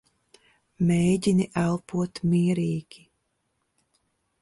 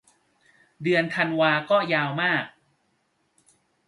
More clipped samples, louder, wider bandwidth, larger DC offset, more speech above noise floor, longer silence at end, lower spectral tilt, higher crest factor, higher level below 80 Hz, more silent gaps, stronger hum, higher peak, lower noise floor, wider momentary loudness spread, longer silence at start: neither; about the same, -25 LUFS vs -23 LUFS; about the same, 11.5 kHz vs 11.5 kHz; neither; first, 52 dB vs 47 dB; first, 1.6 s vs 1.4 s; about the same, -7 dB/octave vs -6 dB/octave; about the same, 16 dB vs 20 dB; first, -56 dBFS vs -72 dBFS; neither; neither; second, -12 dBFS vs -6 dBFS; first, -75 dBFS vs -70 dBFS; about the same, 8 LU vs 7 LU; about the same, 0.8 s vs 0.8 s